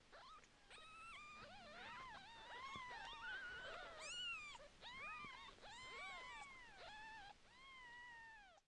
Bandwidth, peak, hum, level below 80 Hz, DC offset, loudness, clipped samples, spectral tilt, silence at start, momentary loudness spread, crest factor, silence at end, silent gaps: 11 kHz; -40 dBFS; none; -74 dBFS; under 0.1%; -55 LUFS; under 0.1%; -1.5 dB/octave; 0 s; 11 LU; 16 dB; 0.05 s; none